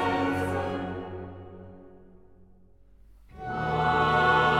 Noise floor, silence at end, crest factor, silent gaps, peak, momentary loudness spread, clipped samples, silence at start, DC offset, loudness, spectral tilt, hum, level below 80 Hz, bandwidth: -57 dBFS; 0 s; 18 dB; none; -12 dBFS; 24 LU; under 0.1%; 0 s; 0.1%; -26 LUFS; -6 dB/octave; none; -50 dBFS; 15.5 kHz